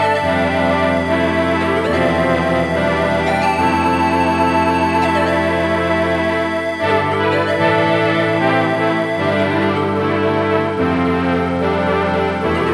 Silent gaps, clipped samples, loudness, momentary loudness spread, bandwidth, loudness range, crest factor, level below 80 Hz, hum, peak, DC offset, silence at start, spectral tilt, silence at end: none; under 0.1%; -16 LUFS; 3 LU; 14 kHz; 1 LU; 14 dB; -40 dBFS; none; -2 dBFS; under 0.1%; 0 s; -6.5 dB/octave; 0 s